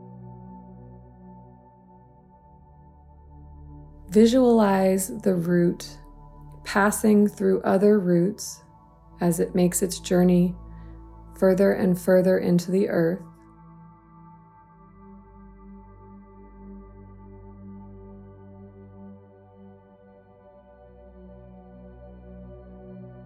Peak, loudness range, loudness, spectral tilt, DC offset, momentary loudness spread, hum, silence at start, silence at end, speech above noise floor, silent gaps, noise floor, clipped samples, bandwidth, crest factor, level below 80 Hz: -6 dBFS; 5 LU; -22 LUFS; -6.5 dB/octave; under 0.1%; 26 LU; none; 0.05 s; 0 s; 32 dB; none; -52 dBFS; under 0.1%; 15.5 kHz; 20 dB; -50 dBFS